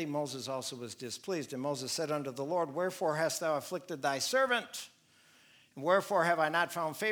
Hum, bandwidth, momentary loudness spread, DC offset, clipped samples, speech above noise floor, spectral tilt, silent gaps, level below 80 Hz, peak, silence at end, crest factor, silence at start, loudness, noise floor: none; over 20 kHz; 12 LU; under 0.1%; under 0.1%; 31 dB; -3.5 dB/octave; none; -86 dBFS; -14 dBFS; 0 s; 20 dB; 0 s; -33 LUFS; -64 dBFS